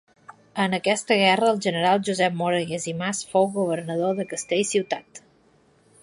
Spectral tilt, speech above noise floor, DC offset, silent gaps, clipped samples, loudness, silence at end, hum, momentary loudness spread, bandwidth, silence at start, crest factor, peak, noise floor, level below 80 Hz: -4 dB/octave; 37 dB; under 0.1%; none; under 0.1%; -23 LUFS; 0.85 s; none; 9 LU; 11.5 kHz; 0.3 s; 20 dB; -4 dBFS; -59 dBFS; -68 dBFS